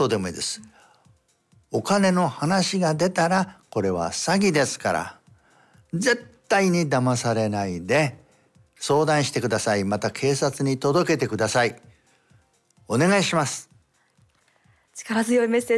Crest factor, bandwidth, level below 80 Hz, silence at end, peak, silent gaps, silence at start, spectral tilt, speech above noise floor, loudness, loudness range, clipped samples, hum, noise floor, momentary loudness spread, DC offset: 16 dB; 12 kHz; -66 dBFS; 0 s; -8 dBFS; none; 0 s; -4.5 dB/octave; 41 dB; -23 LUFS; 3 LU; under 0.1%; none; -63 dBFS; 9 LU; under 0.1%